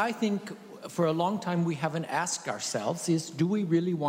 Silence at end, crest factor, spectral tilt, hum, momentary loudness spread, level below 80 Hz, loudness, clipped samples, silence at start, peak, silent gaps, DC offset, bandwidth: 0 s; 14 dB; -5 dB/octave; none; 6 LU; -74 dBFS; -29 LUFS; under 0.1%; 0 s; -14 dBFS; none; under 0.1%; 16 kHz